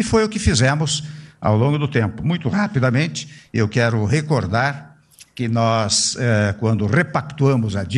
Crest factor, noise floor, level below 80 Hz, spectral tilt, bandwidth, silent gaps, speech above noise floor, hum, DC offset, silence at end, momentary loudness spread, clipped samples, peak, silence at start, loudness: 16 dB; -48 dBFS; -40 dBFS; -5 dB/octave; 11 kHz; none; 30 dB; none; under 0.1%; 0 s; 7 LU; under 0.1%; -4 dBFS; 0 s; -19 LUFS